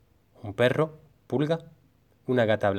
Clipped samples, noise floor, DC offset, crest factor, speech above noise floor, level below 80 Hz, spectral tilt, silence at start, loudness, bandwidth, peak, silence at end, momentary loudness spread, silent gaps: under 0.1%; -63 dBFS; under 0.1%; 18 dB; 38 dB; -66 dBFS; -7.5 dB/octave; 0.45 s; -27 LUFS; 13 kHz; -8 dBFS; 0 s; 15 LU; none